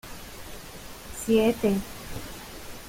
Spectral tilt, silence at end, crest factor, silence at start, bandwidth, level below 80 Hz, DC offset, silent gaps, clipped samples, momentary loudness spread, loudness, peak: -5 dB/octave; 0 s; 18 dB; 0.05 s; 17 kHz; -46 dBFS; under 0.1%; none; under 0.1%; 19 LU; -26 LUFS; -10 dBFS